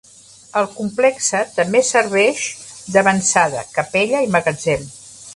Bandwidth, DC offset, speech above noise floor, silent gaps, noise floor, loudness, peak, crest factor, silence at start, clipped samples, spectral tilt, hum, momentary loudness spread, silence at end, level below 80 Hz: 11.5 kHz; under 0.1%; 27 dB; none; -44 dBFS; -17 LUFS; 0 dBFS; 18 dB; 0.55 s; under 0.1%; -3.5 dB/octave; none; 9 LU; 0.05 s; -54 dBFS